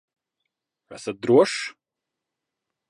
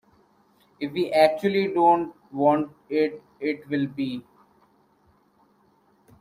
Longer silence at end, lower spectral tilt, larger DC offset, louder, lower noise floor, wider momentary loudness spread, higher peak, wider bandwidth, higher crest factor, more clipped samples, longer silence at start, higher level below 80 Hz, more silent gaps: second, 1.2 s vs 2 s; second, -5 dB/octave vs -7 dB/octave; neither; first, -21 LUFS vs -24 LUFS; first, -85 dBFS vs -63 dBFS; first, 17 LU vs 12 LU; about the same, -4 dBFS vs -4 dBFS; second, 11.5 kHz vs 15.5 kHz; about the same, 22 dB vs 22 dB; neither; about the same, 0.9 s vs 0.8 s; second, -74 dBFS vs -68 dBFS; neither